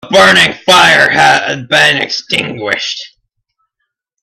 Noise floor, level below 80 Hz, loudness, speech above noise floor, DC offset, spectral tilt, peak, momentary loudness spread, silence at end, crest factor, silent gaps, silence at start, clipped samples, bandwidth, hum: -72 dBFS; -48 dBFS; -8 LUFS; 62 dB; under 0.1%; -2.5 dB/octave; 0 dBFS; 11 LU; 1.15 s; 10 dB; none; 0.05 s; 0.4%; 16.5 kHz; none